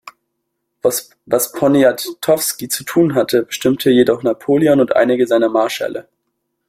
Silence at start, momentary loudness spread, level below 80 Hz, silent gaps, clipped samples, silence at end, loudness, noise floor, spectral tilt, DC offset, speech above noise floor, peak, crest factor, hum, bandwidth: 0.05 s; 8 LU; -58 dBFS; none; under 0.1%; 0.7 s; -15 LUFS; -73 dBFS; -4.5 dB/octave; under 0.1%; 58 dB; 0 dBFS; 14 dB; none; 16.5 kHz